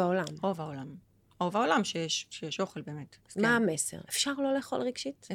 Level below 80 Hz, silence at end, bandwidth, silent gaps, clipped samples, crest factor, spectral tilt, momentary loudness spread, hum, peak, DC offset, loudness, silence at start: -74 dBFS; 0 s; 18 kHz; none; under 0.1%; 20 dB; -3.5 dB/octave; 14 LU; none; -12 dBFS; under 0.1%; -31 LUFS; 0 s